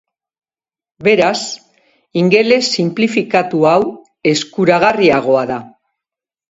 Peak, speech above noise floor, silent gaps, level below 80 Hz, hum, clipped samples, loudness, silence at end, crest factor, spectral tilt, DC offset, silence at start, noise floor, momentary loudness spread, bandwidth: 0 dBFS; over 77 dB; none; -56 dBFS; none; under 0.1%; -13 LUFS; 0.8 s; 14 dB; -5 dB/octave; under 0.1%; 1 s; under -90 dBFS; 11 LU; 8 kHz